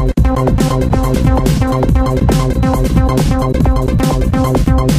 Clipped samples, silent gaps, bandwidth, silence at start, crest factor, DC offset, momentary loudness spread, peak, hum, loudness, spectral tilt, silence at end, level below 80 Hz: under 0.1%; none; 15.5 kHz; 0 s; 12 dB; under 0.1%; 1 LU; 0 dBFS; none; -13 LUFS; -7 dB/octave; 0 s; -16 dBFS